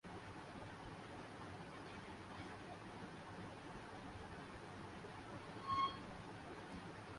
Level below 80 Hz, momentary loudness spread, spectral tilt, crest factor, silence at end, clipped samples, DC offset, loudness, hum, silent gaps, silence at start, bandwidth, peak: -68 dBFS; 10 LU; -5 dB/octave; 20 dB; 0 s; under 0.1%; under 0.1%; -50 LUFS; none; none; 0.05 s; 11.5 kHz; -30 dBFS